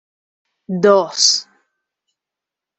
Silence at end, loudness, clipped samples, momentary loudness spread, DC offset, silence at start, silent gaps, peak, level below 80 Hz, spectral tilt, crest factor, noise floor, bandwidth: 1.35 s; -14 LUFS; under 0.1%; 8 LU; under 0.1%; 0.7 s; none; -2 dBFS; -68 dBFS; -2.5 dB/octave; 18 dB; -85 dBFS; 8.4 kHz